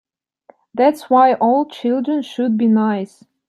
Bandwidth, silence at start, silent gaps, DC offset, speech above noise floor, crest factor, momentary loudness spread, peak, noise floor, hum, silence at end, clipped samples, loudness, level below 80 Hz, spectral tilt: 13 kHz; 0.75 s; none; under 0.1%; 36 dB; 16 dB; 10 LU; -2 dBFS; -52 dBFS; none; 0.4 s; under 0.1%; -16 LUFS; -72 dBFS; -7 dB/octave